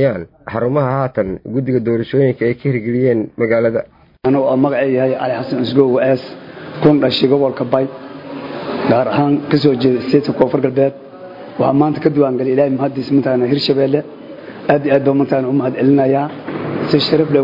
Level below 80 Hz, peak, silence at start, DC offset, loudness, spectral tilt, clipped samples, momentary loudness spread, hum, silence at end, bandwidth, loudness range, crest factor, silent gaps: -52 dBFS; 0 dBFS; 0 s; under 0.1%; -15 LUFS; -9 dB/octave; under 0.1%; 12 LU; none; 0 s; 5.4 kHz; 1 LU; 14 dB; none